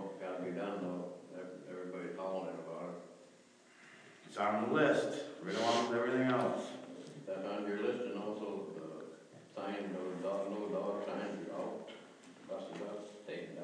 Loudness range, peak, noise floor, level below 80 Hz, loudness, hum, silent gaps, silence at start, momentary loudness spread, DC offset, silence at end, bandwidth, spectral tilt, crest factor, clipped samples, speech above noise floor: 9 LU; -18 dBFS; -63 dBFS; under -90 dBFS; -39 LUFS; none; none; 0 s; 19 LU; under 0.1%; 0 s; 10.5 kHz; -5.5 dB/octave; 22 dB; under 0.1%; 29 dB